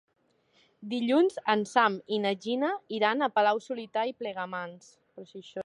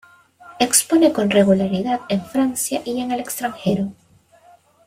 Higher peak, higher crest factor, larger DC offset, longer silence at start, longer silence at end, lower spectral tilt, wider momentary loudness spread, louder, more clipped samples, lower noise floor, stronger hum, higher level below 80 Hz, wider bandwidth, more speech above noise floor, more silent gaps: second, -10 dBFS vs -2 dBFS; about the same, 20 dB vs 18 dB; neither; first, 0.8 s vs 0.45 s; second, 0 s vs 0.95 s; about the same, -5 dB/octave vs -4 dB/octave; first, 15 LU vs 9 LU; second, -28 LUFS vs -19 LUFS; neither; first, -67 dBFS vs -52 dBFS; neither; second, -82 dBFS vs -58 dBFS; second, 11.5 kHz vs 16.5 kHz; first, 38 dB vs 34 dB; neither